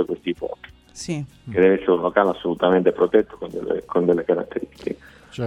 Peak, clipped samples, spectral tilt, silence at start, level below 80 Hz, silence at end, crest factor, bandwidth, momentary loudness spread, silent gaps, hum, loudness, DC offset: -2 dBFS; under 0.1%; -6.5 dB/octave; 0 s; -54 dBFS; 0 s; 20 dB; 11 kHz; 15 LU; none; none; -21 LUFS; under 0.1%